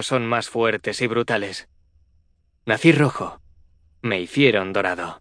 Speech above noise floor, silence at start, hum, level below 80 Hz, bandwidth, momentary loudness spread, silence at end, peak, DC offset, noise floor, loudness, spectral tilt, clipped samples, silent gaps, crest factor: 41 dB; 0 s; none; -58 dBFS; 10.5 kHz; 15 LU; 0.05 s; -2 dBFS; under 0.1%; -62 dBFS; -21 LUFS; -5.5 dB/octave; under 0.1%; none; 20 dB